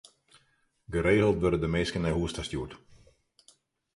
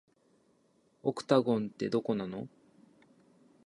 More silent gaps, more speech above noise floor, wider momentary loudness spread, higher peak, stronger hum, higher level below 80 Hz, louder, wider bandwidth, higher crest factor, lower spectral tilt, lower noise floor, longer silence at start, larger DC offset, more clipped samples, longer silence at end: neither; first, 43 dB vs 39 dB; about the same, 12 LU vs 14 LU; about the same, -12 dBFS vs -12 dBFS; neither; first, -46 dBFS vs -76 dBFS; first, -28 LUFS vs -32 LUFS; about the same, 11.5 kHz vs 11.5 kHz; second, 18 dB vs 24 dB; about the same, -6 dB/octave vs -7 dB/octave; about the same, -70 dBFS vs -70 dBFS; second, 0.9 s vs 1.05 s; neither; neither; about the same, 1.2 s vs 1.2 s